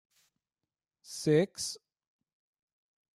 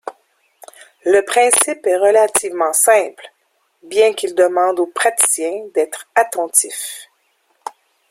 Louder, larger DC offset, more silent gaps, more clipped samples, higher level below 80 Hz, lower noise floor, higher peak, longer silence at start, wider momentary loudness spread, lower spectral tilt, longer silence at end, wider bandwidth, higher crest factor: second, -31 LUFS vs -15 LUFS; neither; neither; neither; second, -76 dBFS vs -66 dBFS; first, under -90 dBFS vs -63 dBFS; second, -16 dBFS vs 0 dBFS; first, 1.1 s vs 0.05 s; about the same, 17 LU vs 15 LU; first, -5 dB/octave vs 0 dB/octave; first, 1.4 s vs 1.05 s; second, 14 kHz vs 16.5 kHz; first, 22 dB vs 16 dB